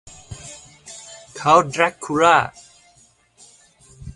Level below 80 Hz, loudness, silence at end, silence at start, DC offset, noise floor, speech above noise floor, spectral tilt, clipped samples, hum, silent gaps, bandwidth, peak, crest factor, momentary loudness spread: -50 dBFS; -17 LUFS; 0.05 s; 0.3 s; under 0.1%; -56 dBFS; 39 dB; -4 dB/octave; under 0.1%; none; none; 11.5 kHz; 0 dBFS; 22 dB; 24 LU